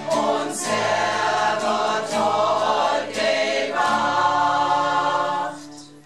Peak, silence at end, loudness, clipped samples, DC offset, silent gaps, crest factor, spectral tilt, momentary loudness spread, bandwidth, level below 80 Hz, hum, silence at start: -8 dBFS; 0.05 s; -21 LUFS; under 0.1%; 0.3%; none; 14 dB; -3 dB/octave; 4 LU; 13.5 kHz; -70 dBFS; none; 0 s